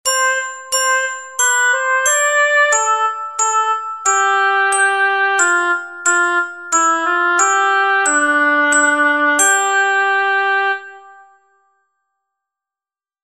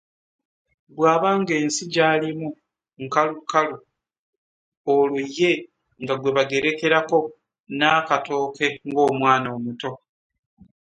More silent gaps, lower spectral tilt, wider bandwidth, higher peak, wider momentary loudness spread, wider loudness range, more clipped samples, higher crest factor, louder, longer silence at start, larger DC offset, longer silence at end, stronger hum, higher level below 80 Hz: second, none vs 4.19-4.85 s, 7.60-7.64 s; second, 2 dB/octave vs -4.5 dB/octave; first, 14 kHz vs 9.6 kHz; about the same, -2 dBFS vs -2 dBFS; second, 6 LU vs 13 LU; about the same, 3 LU vs 3 LU; neither; second, 14 dB vs 20 dB; first, -14 LUFS vs -21 LUFS; second, 0.05 s vs 0.95 s; first, 0.1% vs under 0.1%; first, 2.15 s vs 0.85 s; neither; about the same, -66 dBFS vs -68 dBFS